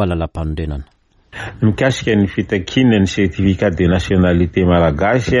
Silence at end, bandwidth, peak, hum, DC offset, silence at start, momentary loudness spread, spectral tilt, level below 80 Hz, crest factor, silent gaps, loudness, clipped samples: 0 s; 11.5 kHz; -2 dBFS; none; under 0.1%; 0 s; 11 LU; -7 dB/octave; -30 dBFS; 12 dB; none; -15 LUFS; under 0.1%